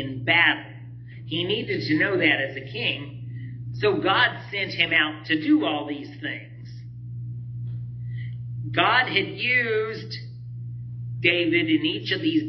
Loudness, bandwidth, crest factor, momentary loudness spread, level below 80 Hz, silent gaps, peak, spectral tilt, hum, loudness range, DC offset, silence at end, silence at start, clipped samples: -23 LUFS; 6.2 kHz; 20 dB; 17 LU; -58 dBFS; none; -4 dBFS; -7 dB/octave; 60 Hz at -35 dBFS; 4 LU; under 0.1%; 0 s; 0 s; under 0.1%